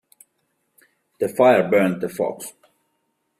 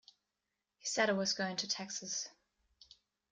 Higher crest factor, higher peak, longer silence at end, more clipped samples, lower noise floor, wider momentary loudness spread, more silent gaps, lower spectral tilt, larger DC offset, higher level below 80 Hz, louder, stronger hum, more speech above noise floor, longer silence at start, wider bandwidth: about the same, 18 dB vs 22 dB; first, -4 dBFS vs -18 dBFS; about the same, 0.9 s vs 1 s; neither; second, -72 dBFS vs -89 dBFS; first, 16 LU vs 9 LU; neither; first, -6 dB/octave vs -2 dB/octave; neither; first, -66 dBFS vs -80 dBFS; first, -19 LUFS vs -36 LUFS; neither; about the same, 53 dB vs 52 dB; first, 1.2 s vs 0.85 s; first, 15.5 kHz vs 10.5 kHz